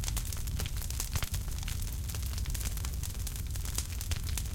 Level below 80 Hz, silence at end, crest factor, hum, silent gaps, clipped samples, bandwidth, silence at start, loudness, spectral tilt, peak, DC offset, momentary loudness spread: -36 dBFS; 0 s; 18 dB; none; none; under 0.1%; 17 kHz; 0 s; -36 LUFS; -3 dB/octave; -16 dBFS; under 0.1%; 2 LU